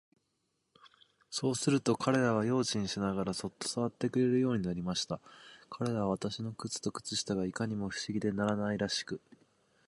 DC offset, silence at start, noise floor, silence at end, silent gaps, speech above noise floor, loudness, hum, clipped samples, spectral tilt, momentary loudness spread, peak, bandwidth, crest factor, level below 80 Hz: under 0.1%; 0.85 s; -80 dBFS; 0.7 s; none; 47 dB; -33 LUFS; none; under 0.1%; -5 dB/octave; 10 LU; -14 dBFS; 11.5 kHz; 20 dB; -64 dBFS